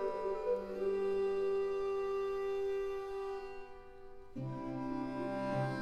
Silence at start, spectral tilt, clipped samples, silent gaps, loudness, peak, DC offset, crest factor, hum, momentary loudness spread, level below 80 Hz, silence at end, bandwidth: 0 s; -7.5 dB/octave; under 0.1%; none; -38 LUFS; -24 dBFS; under 0.1%; 14 dB; none; 15 LU; -58 dBFS; 0 s; 9.2 kHz